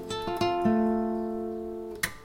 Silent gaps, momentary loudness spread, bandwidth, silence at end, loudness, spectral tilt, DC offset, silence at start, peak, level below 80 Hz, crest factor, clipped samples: none; 10 LU; 17 kHz; 0 s; -29 LUFS; -5 dB/octave; under 0.1%; 0 s; -10 dBFS; -52 dBFS; 18 dB; under 0.1%